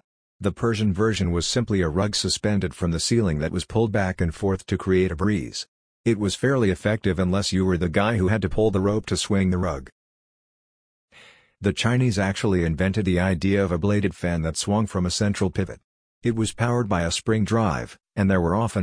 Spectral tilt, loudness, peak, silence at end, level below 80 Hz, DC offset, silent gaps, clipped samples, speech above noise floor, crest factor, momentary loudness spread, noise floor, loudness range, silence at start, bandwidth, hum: -5.5 dB/octave; -23 LUFS; -6 dBFS; 0 s; -42 dBFS; under 0.1%; 5.68-6.04 s, 9.92-11.08 s, 15.84-16.21 s; under 0.1%; 30 dB; 16 dB; 5 LU; -52 dBFS; 3 LU; 0.4 s; 10.5 kHz; none